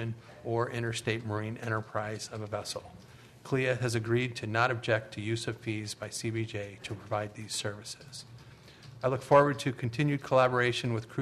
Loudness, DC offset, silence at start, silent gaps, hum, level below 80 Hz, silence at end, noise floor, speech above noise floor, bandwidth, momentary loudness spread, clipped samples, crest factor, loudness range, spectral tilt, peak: -31 LUFS; under 0.1%; 0 s; none; none; -64 dBFS; 0 s; -52 dBFS; 21 dB; 13 kHz; 16 LU; under 0.1%; 22 dB; 8 LU; -5 dB/octave; -10 dBFS